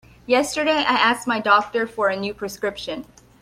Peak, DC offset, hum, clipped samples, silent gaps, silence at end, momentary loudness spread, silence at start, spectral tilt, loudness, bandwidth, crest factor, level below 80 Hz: -2 dBFS; under 0.1%; none; under 0.1%; none; 0.4 s; 11 LU; 0.3 s; -3 dB/octave; -20 LUFS; 16 kHz; 18 dB; -56 dBFS